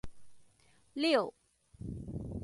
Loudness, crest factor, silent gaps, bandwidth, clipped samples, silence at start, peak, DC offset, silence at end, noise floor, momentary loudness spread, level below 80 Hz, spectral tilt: -34 LUFS; 22 dB; none; 11.5 kHz; under 0.1%; 0.05 s; -16 dBFS; under 0.1%; 0 s; -66 dBFS; 18 LU; -54 dBFS; -5.5 dB/octave